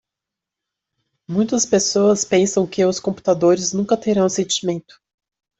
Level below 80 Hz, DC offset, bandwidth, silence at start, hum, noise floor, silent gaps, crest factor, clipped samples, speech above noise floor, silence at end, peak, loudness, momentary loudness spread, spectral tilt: -60 dBFS; under 0.1%; 8.4 kHz; 1.3 s; none; -85 dBFS; none; 16 dB; under 0.1%; 67 dB; 0.8 s; -4 dBFS; -18 LUFS; 6 LU; -4 dB/octave